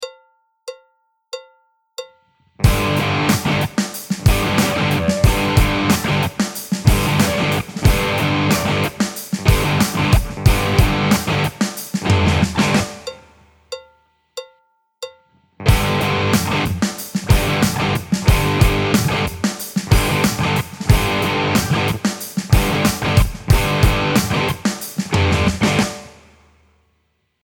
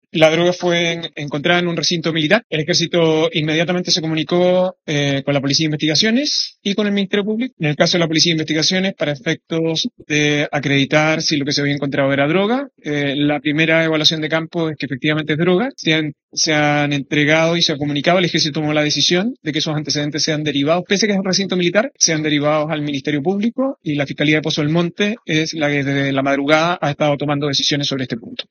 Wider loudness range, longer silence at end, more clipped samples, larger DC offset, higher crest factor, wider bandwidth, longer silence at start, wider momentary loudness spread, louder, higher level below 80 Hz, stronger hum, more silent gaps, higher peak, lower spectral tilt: first, 4 LU vs 1 LU; first, 1.35 s vs 0.05 s; neither; neither; about the same, 18 dB vs 18 dB; first, 19 kHz vs 7.2 kHz; second, 0 s vs 0.15 s; first, 18 LU vs 6 LU; about the same, -17 LUFS vs -17 LUFS; first, -26 dBFS vs -60 dBFS; neither; second, none vs 2.44-2.50 s, 7.53-7.57 s, 16.23-16.29 s; about the same, 0 dBFS vs 0 dBFS; about the same, -5 dB/octave vs -4 dB/octave